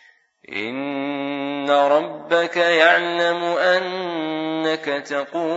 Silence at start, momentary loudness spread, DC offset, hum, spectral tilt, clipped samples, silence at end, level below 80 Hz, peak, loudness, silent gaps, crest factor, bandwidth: 0.5 s; 11 LU; under 0.1%; none; -4 dB/octave; under 0.1%; 0 s; -76 dBFS; 0 dBFS; -20 LUFS; none; 20 dB; 8 kHz